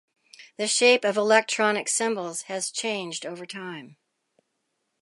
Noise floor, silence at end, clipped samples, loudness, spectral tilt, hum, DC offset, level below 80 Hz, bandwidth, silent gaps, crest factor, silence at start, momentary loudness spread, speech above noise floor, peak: -77 dBFS; 1.1 s; under 0.1%; -23 LUFS; -1.5 dB/octave; none; under 0.1%; -82 dBFS; 11.5 kHz; none; 22 dB; 0.4 s; 17 LU; 52 dB; -4 dBFS